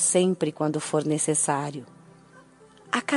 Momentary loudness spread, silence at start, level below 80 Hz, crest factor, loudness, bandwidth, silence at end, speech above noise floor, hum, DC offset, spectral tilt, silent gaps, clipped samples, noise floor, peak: 8 LU; 0 s; -72 dBFS; 18 dB; -25 LUFS; 11.5 kHz; 0 s; 28 dB; none; under 0.1%; -4 dB/octave; none; under 0.1%; -53 dBFS; -8 dBFS